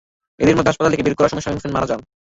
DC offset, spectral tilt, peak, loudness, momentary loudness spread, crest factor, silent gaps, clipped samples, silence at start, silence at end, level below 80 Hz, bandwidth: under 0.1%; -6 dB/octave; -2 dBFS; -18 LUFS; 9 LU; 16 dB; none; under 0.1%; 0.4 s; 0.35 s; -42 dBFS; 8 kHz